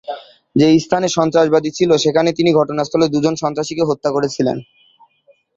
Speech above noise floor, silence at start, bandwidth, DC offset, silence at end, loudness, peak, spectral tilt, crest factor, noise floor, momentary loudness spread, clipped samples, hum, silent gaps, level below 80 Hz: 40 dB; 0.1 s; 7.8 kHz; under 0.1%; 0.95 s; -16 LUFS; 0 dBFS; -5.5 dB/octave; 16 dB; -55 dBFS; 8 LU; under 0.1%; none; none; -54 dBFS